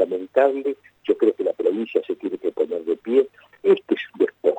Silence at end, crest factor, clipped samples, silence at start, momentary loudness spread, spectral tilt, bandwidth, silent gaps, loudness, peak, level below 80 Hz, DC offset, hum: 0 s; 16 dB; under 0.1%; 0 s; 8 LU; -7 dB/octave; 8 kHz; none; -22 LUFS; -6 dBFS; -72 dBFS; under 0.1%; none